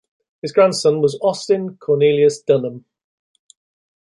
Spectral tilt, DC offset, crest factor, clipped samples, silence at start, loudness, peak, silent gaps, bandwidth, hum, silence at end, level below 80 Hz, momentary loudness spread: -5.5 dB/octave; under 0.1%; 16 dB; under 0.1%; 0.45 s; -17 LUFS; -2 dBFS; none; 11.5 kHz; none; 1.25 s; -66 dBFS; 7 LU